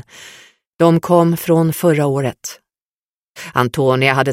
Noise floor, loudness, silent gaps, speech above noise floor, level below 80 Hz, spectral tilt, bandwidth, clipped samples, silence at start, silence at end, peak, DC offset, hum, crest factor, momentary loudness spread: under -90 dBFS; -15 LUFS; 0.67-0.73 s, 2.82-3.35 s; over 75 dB; -56 dBFS; -6 dB/octave; 16.5 kHz; under 0.1%; 0.2 s; 0 s; 0 dBFS; under 0.1%; none; 16 dB; 11 LU